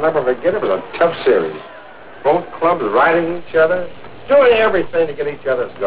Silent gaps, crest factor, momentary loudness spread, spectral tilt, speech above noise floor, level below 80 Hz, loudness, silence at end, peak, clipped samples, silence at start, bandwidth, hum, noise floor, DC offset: none; 14 dB; 10 LU; -9 dB/octave; 22 dB; -50 dBFS; -16 LUFS; 0 s; -2 dBFS; under 0.1%; 0 s; 4 kHz; none; -37 dBFS; 2%